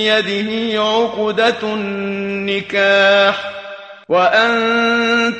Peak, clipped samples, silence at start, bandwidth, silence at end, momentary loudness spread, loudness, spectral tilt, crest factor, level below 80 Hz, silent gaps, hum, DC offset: -2 dBFS; under 0.1%; 0 s; 8.8 kHz; 0 s; 10 LU; -15 LUFS; -4 dB/octave; 14 dB; -60 dBFS; none; none; under 0.1%